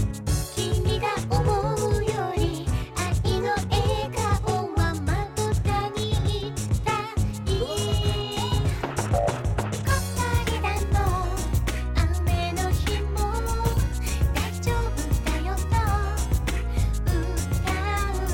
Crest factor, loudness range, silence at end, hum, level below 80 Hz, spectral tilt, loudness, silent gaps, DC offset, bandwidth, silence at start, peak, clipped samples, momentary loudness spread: 12 dB; 1 LU; 0 s; none; -28 dBFS; -5 dB/octave; -26 LUFS; none; under 0.1%; 17 kHz; 0 s; -12 dBFS; under 0.1%; 3 LU